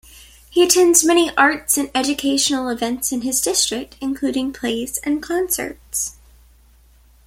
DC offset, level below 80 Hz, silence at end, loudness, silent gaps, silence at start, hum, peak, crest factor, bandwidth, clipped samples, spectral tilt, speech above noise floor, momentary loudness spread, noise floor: under 0.1%; -48 dBFS; 1.15 s; -18 LUFS; none; 0.15 s; none; 0 dBFS; 20 dB; 16.5 kHz; under 0.1%; -1 dB/octave; 32 dB; 11 LU; -51 dBFS